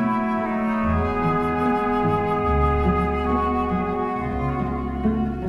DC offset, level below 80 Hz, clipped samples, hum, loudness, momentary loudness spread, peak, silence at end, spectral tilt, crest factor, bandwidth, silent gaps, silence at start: under 0.1%; -32 dBFS; under 0.1%; none; -22 LUFS; 5 LU; -8 dBFS; 0 s; -9 dB/octave; 14 dB; 11.5 kHz; none; 0 s